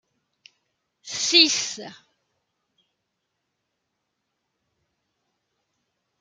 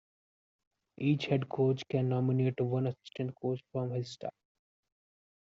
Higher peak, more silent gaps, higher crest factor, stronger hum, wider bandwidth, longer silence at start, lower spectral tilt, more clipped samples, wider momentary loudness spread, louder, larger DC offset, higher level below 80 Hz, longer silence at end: first, -2 dBFS vs -16 dBFS; neither; first, 28 dB vs 18 dB; neither; first, 12.5 kHz vs 7.6 kHz; about the same, 1.05 s vs 1 s; second, 0.5 dB/octave vs -7.5 dB/octave; neither; first, 22 LU vs 10 LU; first, -18 LUFS vs -33 LUFS; neither; about the same, -78 dBFS vs -74 dBFS; first, 4.25 s vs 1.25 s